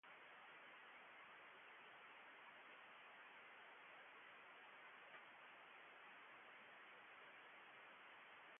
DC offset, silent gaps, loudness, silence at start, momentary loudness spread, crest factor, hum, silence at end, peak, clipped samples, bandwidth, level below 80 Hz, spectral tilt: under 0.1%; none; -62 LUFS; 0.05 s; 1 LU; 14 dB; none; 0 s; -50 dBFS; under 0.1%; 3.6 kHz; under -90 dBFS; 3.5 dB/octave